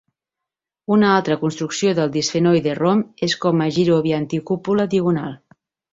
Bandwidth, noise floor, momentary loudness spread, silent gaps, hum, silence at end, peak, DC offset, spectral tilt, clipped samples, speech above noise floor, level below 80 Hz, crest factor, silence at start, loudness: 7.8 kHz; -85 dBFS; 6 LU; none; none; 0.55 s; -2 dBFS; under 0.1%; -5.5 dB/octave; under 0.1%; 67 dB; -58 dBFS; 16 dB; 0.9 s; -19 LUFS